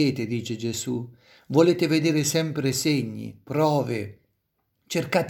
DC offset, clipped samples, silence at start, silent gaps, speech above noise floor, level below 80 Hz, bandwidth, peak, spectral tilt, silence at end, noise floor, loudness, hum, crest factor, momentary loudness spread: under 0.1%; under 0.1%; 0 s; none; 50 dB; -66 dBFS; 17 kHz; -6 dBFS; -5 dB/octave; 0 s; -74 dBFS; -24 LUFS; none; 20 dB; 12 LU